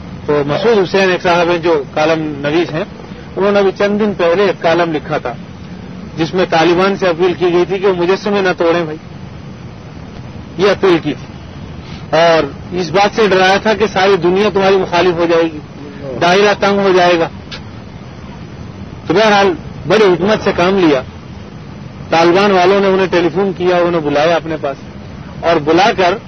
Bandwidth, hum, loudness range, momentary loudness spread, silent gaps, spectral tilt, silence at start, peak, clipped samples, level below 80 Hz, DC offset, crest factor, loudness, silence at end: 6.6 kHz; none; 4 LU; 20 LU; none; -5.5 dB/octave; 0 s; 0 dBFS; under 0.1%; -42 dBFS; 0.5%; 14 dB; -12 LUFS; 0 s